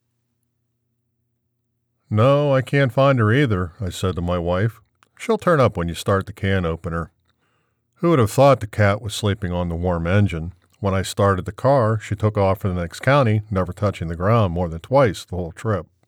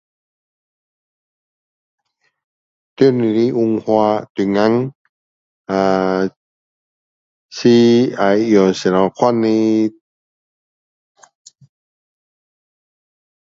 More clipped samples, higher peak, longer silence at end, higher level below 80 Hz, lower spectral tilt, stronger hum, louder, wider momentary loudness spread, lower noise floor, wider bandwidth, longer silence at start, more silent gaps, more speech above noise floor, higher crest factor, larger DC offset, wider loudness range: neither; second, -4 dBFS vs 0 dBFS; second, 0.25 s vs 3.7 s; first, -42 dBFS vs -58 dBFS; about the same, -7 dB/octave vs -6.5 dB/octave; neither; second, -20 LUFS vs -15 LUFS; about the same, 9 LU vs 8 LU; second, -73 dBFS vs under -90 dBFS; first, 15.5 kHz vs 7.6 kHz; second, 2.1 s vs 3 s; second, none vs 4.30-4.35 s, 4.95-5.65 s, 6.36-7.49 s; second, 54 dB vs over 76 dB; about the same, 16 dB vs 18 dB; neither; second, 2 LU vs 7 LU